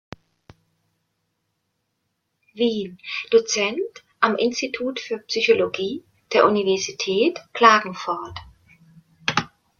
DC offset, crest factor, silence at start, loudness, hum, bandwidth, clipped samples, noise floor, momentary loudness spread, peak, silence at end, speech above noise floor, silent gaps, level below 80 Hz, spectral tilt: under 0.1%; 22 dB; 2.55 s; -21 LUFS; none; 7.4 kHz; under 0.1%; -75 dBFS; 13 LU; -2 dBFS; 0.35 s; 54 dB; none; -62 dBFS; -3 dB/octave